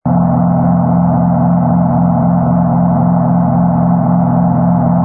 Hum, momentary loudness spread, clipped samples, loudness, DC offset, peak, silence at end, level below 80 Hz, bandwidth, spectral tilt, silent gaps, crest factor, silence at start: none; 0 LU; under 0.1%; -11 LUFS; under 0.1%; 0 dBFS; 0 s; -36 dBFS; 2.1 kHz; -16.5 dB/octave; none; 10 dB; 0.05 s